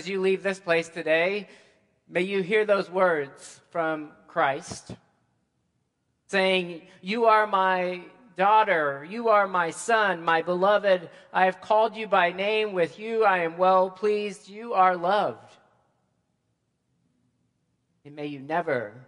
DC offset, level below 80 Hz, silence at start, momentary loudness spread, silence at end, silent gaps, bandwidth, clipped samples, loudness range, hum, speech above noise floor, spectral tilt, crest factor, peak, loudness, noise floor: under 0.1%; -74 dBFS; 0 s; 13 LU; 0.05 s; none; 11.5 kHz; under 0.1%; 7 LU; none; 50 dB; -4.5 dB/octave; 20 dB; -6 dBFS; -24 LUFS; -75 dBFS